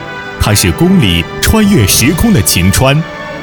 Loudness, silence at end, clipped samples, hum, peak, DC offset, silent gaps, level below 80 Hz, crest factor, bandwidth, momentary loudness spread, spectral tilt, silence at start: -9 LUFS; 0 s; 0.5%; none; 0 dBFS; under 0.1%; none; -22 dBFS; 10 dB; over 20 kHz; 7 LU; -4.5 dB/octave; 0 s